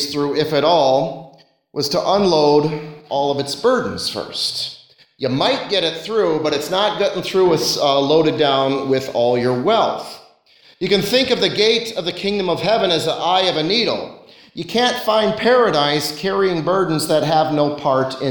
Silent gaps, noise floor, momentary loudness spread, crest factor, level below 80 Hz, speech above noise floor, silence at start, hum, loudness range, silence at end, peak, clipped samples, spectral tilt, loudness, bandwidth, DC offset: none; -51 dBFS; 9 LU; 16 dB; -54 dBFS; 34 dB; 0 s; none; 3 LU; 0 s; -2 dBFS; under 0.1%; -4.5 dB/octave; -17 LUFS; 19 kHz; under 0.1%